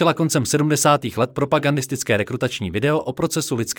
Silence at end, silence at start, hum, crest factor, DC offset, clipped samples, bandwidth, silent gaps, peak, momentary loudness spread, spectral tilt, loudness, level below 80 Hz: 0.05 s; 0 s; none; 16 dB; under 0.1%; under 0.1%; 19 kHz; none; -4 dBFS; 6 LU; -4.5 dB/octave; -20 LUFS; -56 dBFS